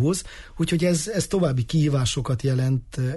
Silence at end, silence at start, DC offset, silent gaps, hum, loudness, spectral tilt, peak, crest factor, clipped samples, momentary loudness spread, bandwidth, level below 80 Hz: 0 s; 0 s; under 0.1%; none; none; -23 LUFS; -5.5 dB/octave; -10 dBFS; 12 dB; under 0.1%; 5 LU; 12 kHz; -42 dBFS